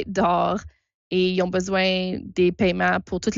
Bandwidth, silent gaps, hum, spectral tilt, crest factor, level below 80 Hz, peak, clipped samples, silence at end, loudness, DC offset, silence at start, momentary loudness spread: 7.6 kHz; 0.94-1.11 s; none; -5.5 dB/octave; 12 dB; -50 dBFS; -10 dBFS; under 0.1%; 0 s; -22 LUFS; under 0.1%; 0 s; 6 LU